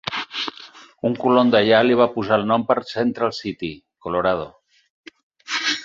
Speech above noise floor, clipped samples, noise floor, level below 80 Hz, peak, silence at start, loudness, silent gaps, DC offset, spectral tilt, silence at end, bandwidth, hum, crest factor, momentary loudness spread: 25 dB; under 0.1%; -44 dBFS; -56 dBFS; -2 dBFS; 0.05 s; -20 LUFS; 4.90-5.04 s, 5.23-5.30 s; under 0.1%; -5 dB/octave; 0 s; 7.6 kHz; none; 20 dB; 15 LU